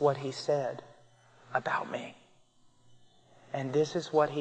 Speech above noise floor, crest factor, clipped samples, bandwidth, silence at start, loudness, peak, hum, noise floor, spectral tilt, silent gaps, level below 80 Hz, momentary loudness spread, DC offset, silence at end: 32 dB; 20 dB; under 0.1%; 9.2 kHz; 0 s; -32 LUFS; -12 dBFS; none; -63 dBFS; -5.5 dB/octave; none; -78 dBFS; 12 LU; under 0.1%; 0 s